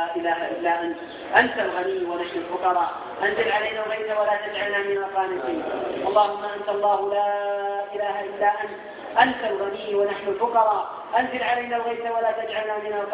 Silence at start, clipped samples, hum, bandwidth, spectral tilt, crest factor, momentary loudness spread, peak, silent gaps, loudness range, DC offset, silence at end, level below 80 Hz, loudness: 0 s; under 0.1%; none; 4 kHz; -7.5 dB/octave; 22 dB; 7 LU; -2 dBFS; none; 1 LU; under 0.1%; 0 s; -64 dBFS; -24 LUFS